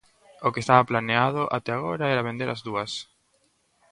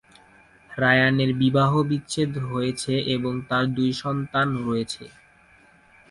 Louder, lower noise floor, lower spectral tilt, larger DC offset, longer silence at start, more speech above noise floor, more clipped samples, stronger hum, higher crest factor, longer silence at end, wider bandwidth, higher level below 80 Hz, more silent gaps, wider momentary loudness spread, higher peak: about the same, -25 LUFS vs -23 LUFS; first, -67 dBFS vs -55 dBFS; about the same, -5.5 dB/octave vs -6 dB/octave; neither; second, 0.4 s vs 0.7 s; first, 43 dB vs 32 dB; neither; neither; about the same, 24 dB vs 20 dB; second, 0.9 s vs 1.05 s; about the same, 11 kHz vs 11.5 kHz; second, -62 dBFS vs -56 dBFS; neither; about the same, 10 LU vs 9 LU; first, -2 dBFS vs -6 dBFS